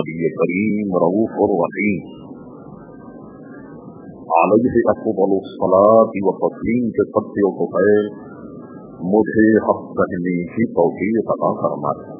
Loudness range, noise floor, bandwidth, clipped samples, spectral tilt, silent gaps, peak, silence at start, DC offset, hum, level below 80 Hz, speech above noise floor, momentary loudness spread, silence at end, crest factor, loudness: 5 LU; -37 dBFS; 3.8 kHz; under 0.1%; -12 dB/octave; none; 0 dBFS; 0 s; under 0.1%; none; -50 dBFS; 20 dB; 23 LU; 0 s; 18 dB; -17 LUFS